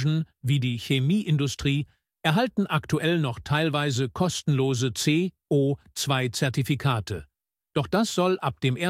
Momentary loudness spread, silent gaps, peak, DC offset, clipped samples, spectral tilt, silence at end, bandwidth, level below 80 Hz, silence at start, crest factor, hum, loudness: 5 LU; none; -8 dBFS; under 0.1%; under 0.1%; -5.5 dB/octave; 0 s; 15.5 kHz; -54 dBFS; 0 s; 18 dB; none; -25 LUFS